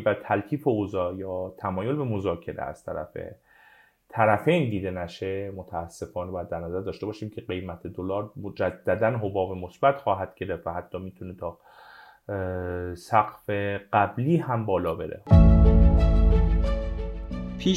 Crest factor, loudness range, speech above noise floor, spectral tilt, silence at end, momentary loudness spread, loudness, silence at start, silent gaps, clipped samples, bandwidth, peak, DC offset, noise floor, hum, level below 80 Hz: 20 dB; 11 LU; 32 dB; -8 dB/octave; 0 s; 15 LU; -26 LUFS; 0 s; none; under 0.1%; 9 kHz; -4 dBFS; under 0.1%; -57 dBFS; none; -30 dBFS